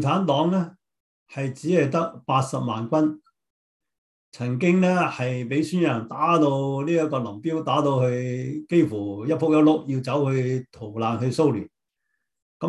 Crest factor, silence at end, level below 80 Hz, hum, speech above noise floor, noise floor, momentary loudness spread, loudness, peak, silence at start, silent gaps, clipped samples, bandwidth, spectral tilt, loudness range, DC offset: 18 dB; 0 s; -64 dBFS; none; 56 dB; -79 dBFS; 10 LU; -23 LUFS; -6 dBFS; 0 s; 1.00-1.26 s, 3.50-3.80 s, 3.98-4.32 s, 12.42-12.60 s; under 0.1%; 12 kHz; -7 dB/octave; 3 LU; under 0.1%